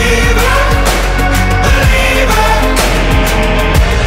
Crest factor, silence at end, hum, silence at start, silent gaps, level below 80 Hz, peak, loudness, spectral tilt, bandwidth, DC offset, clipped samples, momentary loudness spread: 8 dB; 0 s; none; 0 s; none; -12 dBFS; 0 dBFS; -10 LUFS; -4.5 dB/octave; 16.5 kHz; under 0.1%; under 0.1%; 2 LU